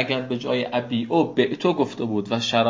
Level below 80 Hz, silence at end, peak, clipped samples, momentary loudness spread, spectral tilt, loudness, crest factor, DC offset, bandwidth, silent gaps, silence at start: -64 dBFS; 0 s; -4 dBFS; under 0.1%; 4 LU; -5.5 dB/octave; -23 LUFS; 18 dB; under 0.1%; 7.6 kHz; none; 0 s